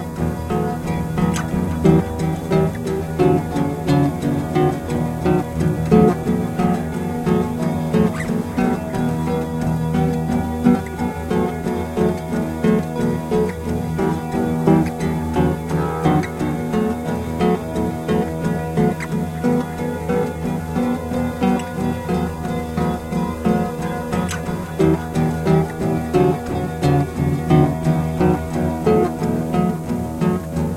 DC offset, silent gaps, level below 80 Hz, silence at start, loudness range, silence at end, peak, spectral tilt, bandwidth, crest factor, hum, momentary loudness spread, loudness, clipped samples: under 0.1%; none; -38 dBFS; 0 s; 3 LU; 0 s; 0 dBFS; -7.5 dB/octave; 16 kHz; 18 dB; none; 6 LU; -20 LUFS; under 0.1%